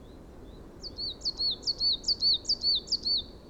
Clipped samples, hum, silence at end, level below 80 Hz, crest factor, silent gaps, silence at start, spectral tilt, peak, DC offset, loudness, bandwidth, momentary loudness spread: under 0.1%; none; 0 s; -50 dBFS; 14 dB; none; 0 s; -2 dB/octave; -18 dBFS; under 0.1%; -27 LUFS; 15 kHz; 11 LU